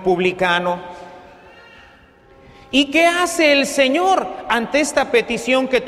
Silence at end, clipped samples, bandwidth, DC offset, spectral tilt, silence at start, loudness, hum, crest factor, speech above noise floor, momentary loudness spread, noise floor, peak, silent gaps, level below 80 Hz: 0 s; under 0.1%; 15 kHz; under 0.1%; -3 dB/octave; 0 s; -17 LUFS; none; 16 dB; 31 dB; 7 LU; -48 dBFS; -2 dBFS; none; -50 dBFS